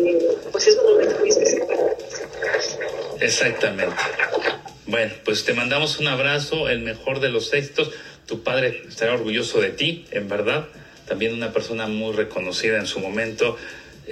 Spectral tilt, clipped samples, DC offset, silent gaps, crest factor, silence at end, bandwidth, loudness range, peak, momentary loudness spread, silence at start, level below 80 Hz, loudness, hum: -3 dB/octave; under 0.1%; under 0.1%; none; 18 dB; 0 s; 12.5 kHz; 5 LU; -4 dBFS; 10 LU; 0 s; -54 dBFS; -21 LUFS; none